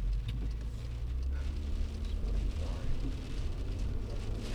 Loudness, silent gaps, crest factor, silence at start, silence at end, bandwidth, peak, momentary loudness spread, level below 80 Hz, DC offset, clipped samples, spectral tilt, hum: -39 LUFS; none; 12 dB; 0 s; 0 s; 10.5 kHz; -22 dBFS; 3 LU; -34 dBFS; under 0.1%; under 0.1%; -6.5 dB/octave; none